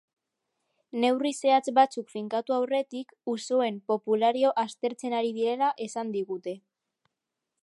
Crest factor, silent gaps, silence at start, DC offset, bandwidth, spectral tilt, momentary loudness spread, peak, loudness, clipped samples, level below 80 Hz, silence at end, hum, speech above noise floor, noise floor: 20 dB; none; 0.95 s; under 0.1%; 11.5 kHz; -4 dB/octave; 12 LU; -10 dBFS; -27 LUFS; under 0.1%; -86 dBFS; 1.05 s; none; 59 dB; -86 dBFS